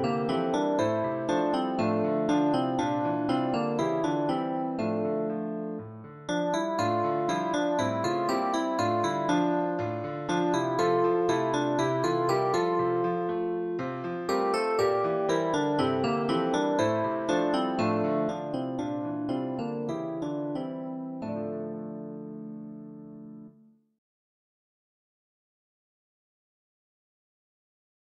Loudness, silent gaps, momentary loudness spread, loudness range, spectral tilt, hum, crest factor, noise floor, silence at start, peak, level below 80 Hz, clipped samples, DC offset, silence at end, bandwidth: -28 LUFS; none; 10 LU; 10 LU; -6 dB/octave; none; 16 dB; -59 dBFS; 0 s; -12 dBFS; -66 dBFS; under 0.1%; under 0.1%; 4.65 s; 13 kHz